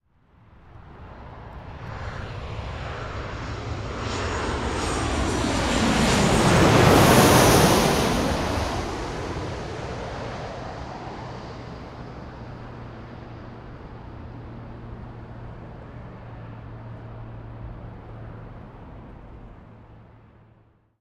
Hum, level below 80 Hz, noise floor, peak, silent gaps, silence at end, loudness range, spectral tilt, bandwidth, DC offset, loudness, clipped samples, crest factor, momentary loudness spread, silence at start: none; -38 dBFS; -58 dBFS; -2 dBFS; none; 0.9 s; 22 LU; -4.5 dB/octave; 16 kHz; under 0.1%; -22 LUFS; under 0.1%; 22 dB; 25 LU; 0.65 s